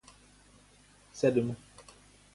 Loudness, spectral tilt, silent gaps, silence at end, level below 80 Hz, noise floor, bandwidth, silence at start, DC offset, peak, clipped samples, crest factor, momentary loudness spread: -30 LUFS; -6.5 dB/octave; none; 0.55 s; -66 dBFS; -61 dBFS; 11.5 kHz; 1.15 s; under 0.1%; -14 dBFS; under 0.1%; 22 dB; 26 LU